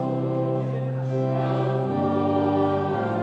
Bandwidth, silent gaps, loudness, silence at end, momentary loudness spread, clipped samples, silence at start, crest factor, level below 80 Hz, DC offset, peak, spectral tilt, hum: 5.8 kHz; none; -24 LUFS; 0 s; 4 LU; under 0.1%; 0 s; 12 dB; -66 dBFS; under 0.1%; -10 dBFS; -9.5 dB/octave; none